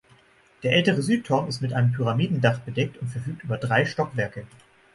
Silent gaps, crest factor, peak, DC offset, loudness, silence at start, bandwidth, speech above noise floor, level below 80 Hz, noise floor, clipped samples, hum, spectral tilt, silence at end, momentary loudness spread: none; 18 dB; -6 dBFS; under 0.1%; -24 LUFS; 0.6 s; 11.5 kHz; 33 dB; -58 dBFS; -57 dBFS; under 0.1%; none; -6.5 dB/octave; 0.5 s; 11 LU